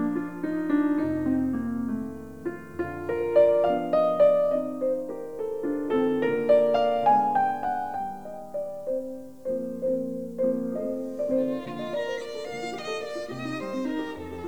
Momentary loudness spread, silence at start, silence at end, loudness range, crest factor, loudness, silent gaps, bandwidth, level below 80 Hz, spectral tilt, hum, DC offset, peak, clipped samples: 13 LU; 0 s; 0 s; 7 LU; 18 dB; -27 LUFS; none; 20 kHz; -60 dBFS; -6.5 dB/octave; none; 0.4%; -10 dBFS; under 0.1%